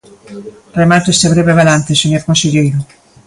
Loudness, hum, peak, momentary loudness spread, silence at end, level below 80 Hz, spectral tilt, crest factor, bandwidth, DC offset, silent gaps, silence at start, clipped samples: -11 LUFS; none; 0 dBFS; 22 LU; 0.45 s; -42 dBFS; -4.5 dB/octave; 12 dB; 11.5 kHz; under 0.1%; none; 0.3 s; under 0.1%